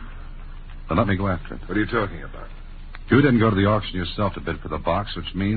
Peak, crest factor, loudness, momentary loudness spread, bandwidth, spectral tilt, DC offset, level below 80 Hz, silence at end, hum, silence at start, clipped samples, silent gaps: -2 dBFS; 20 dB; -22 LUFS; 24 LU; 4.7 kHz; -11.5 dB/octave; under 0.1%; -34 dBFS; 0 s; none; 0 s; under 0.1%; none